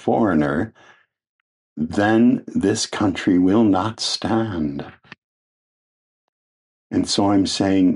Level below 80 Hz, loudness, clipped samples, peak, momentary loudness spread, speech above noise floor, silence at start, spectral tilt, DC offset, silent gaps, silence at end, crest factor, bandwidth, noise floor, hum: -52 dBFS; -19 LUFS; under 0.1%; -4 dBFS; 11 LU; over 71 dB; 0 s; -5 dB/octave; under 0.1%; 1.29-1.76 s, 5.18-6.90 s; 0 s; 16 dB; 11 kHz; under -90 dBFS; none